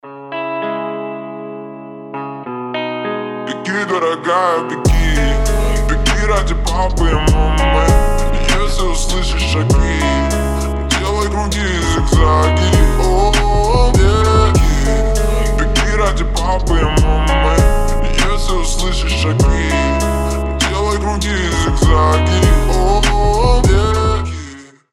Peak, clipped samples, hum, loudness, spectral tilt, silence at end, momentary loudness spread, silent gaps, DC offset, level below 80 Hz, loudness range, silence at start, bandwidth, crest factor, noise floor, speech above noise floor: 0 dBFS; under 0.1%; none; -15 LUFS; -5 dB/octave; 0.3 s; 10 LU; none; under 0.1%; -16 dBFS; 4 LU; 0.05 s; 14 kHz; 12 dB; -34 dBFS; 22 dB